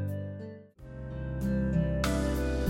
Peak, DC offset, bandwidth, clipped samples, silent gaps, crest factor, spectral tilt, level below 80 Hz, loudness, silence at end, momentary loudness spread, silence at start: -16 dBFS; under 0.1%; 16.5 kHz; under 0.1%; none; 14 dB; -6.5 dB/octave; -38 dBFS; -32 LUFS; 0 s; 16 LU; 0 s